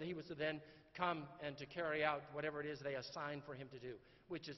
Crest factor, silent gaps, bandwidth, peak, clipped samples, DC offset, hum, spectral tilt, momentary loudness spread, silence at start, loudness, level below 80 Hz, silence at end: 24 dB; none; 6 kHz; -22 dBFS; under 0.1%; under 0.1%; none; -3.5 dB/octave; 13 LU; 0 s; -45 LUFS; -76 dBFS; 0 s